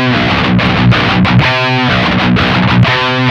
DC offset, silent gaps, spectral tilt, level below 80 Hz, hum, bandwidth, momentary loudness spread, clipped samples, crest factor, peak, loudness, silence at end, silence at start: under 0.1%; none; -6.5 dB/octave; -28 dBFS; none; 7.4 kHz; 2 LU; under 0.1%; 10 dB; 0 dBFS; -9 LUFS; 0 s; 0 s